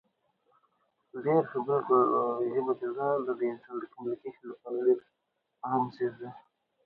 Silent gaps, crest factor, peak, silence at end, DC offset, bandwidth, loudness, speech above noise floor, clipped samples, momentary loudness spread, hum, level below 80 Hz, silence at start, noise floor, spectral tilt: none; 18 dB; -14 dBFS; 0.45 s; under 0.1%; 4.9 kHz; -30 LUFS; 44 dB; under 0.1%; 16 LU; none; -80 dBFS; 1.15 s; -74 dBFS; -10.5 dB/octave